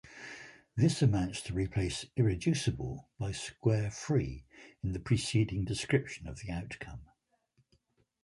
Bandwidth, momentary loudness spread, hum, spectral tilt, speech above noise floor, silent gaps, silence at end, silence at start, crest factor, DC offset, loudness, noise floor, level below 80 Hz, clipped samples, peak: 11.5 kHz; 15 LU; none; -6 dB/octave; 41 dB; none; 1.2 s; 0.05 s; 20 dB; under 0.1%; -33 LUFS; -74 dBFS; -50 dBFS; under 0.1%; -14 dBFS